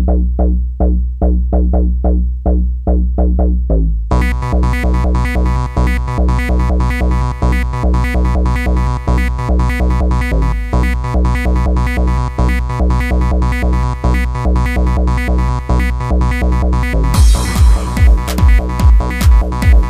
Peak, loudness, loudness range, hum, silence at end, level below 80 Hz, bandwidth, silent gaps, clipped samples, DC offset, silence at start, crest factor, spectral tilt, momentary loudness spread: -2 dBFS; -14 LUFS; 2 LU; none; 0 s; -12 dBFS; 13 kHz; none; under 0.1%; under 0.1%; 0 s; 10 dB; -7 dB/octave; 4 LU